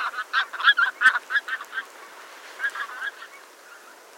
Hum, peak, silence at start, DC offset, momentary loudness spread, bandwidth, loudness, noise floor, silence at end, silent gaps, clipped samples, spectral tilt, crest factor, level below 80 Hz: none; -4 dBFS; 0 s; under 0.1%; 24 LU; 16.5 kHz; -23 LUFS; -47 dBFS; 0.25 s; none; under 0.1%; 2 dB/octave; 22 dB; -76 dBFS